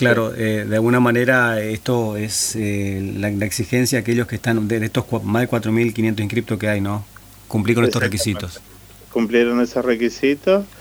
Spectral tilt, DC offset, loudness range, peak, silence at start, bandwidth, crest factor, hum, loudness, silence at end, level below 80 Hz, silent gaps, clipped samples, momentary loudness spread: -5 dB/octave; under 0.1%; 2 LU; 0 dBFS; 0 s; over 20 kHz; 18 dB; none; -19 LUFS; 0 s; -48 dBFS; none; under 0.1%; 8 LU